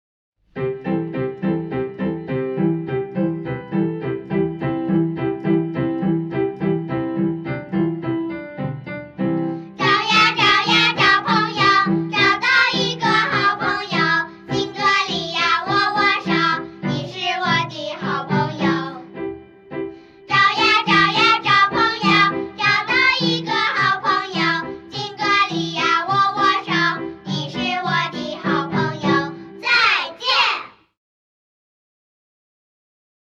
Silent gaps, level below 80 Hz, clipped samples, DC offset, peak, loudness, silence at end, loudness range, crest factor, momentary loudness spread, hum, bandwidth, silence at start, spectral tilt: none; -54 dBFS; under 0.1%; under 0.1%; -4 dBFS; -18 LUFS; 2.6 s; 8 LU; 16 dB; 12 LU; none; 8.4 kHz; 0.55 s; -5 dB/octave